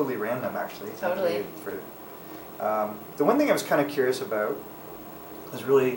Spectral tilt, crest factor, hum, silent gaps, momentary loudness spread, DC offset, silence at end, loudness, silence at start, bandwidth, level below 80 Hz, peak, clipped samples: -5 dB/octave; 20 dB; none; none; 18 LU; under 0.1%; 0 s; -27 LUFS; 0 s; 16.5 kHz; -66 dBFS; -8 dBFS; under 0.1%